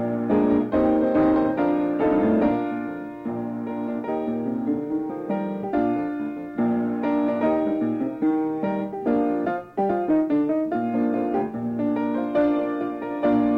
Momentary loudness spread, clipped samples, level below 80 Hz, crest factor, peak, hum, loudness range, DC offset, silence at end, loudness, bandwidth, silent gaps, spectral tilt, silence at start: 8 LU; under 0.1%; -52 dBFS; 10 dB; -12 dBFS; none; 5 LU; under 0.1%; 0 s; -24 LUFS; 4.5 kHz; none; -9.5 dB/octave; 0 s